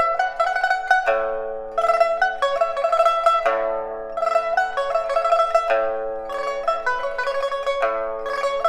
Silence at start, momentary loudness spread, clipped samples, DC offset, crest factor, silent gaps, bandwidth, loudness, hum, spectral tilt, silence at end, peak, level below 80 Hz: 0 s; 8 LU; under 0.1%; under 0.1%; 16 dB; none; 12 kHz; -21 LUFS; none; -1.5 dB/octave; 0 s; -4 dBFS; -54 dBFS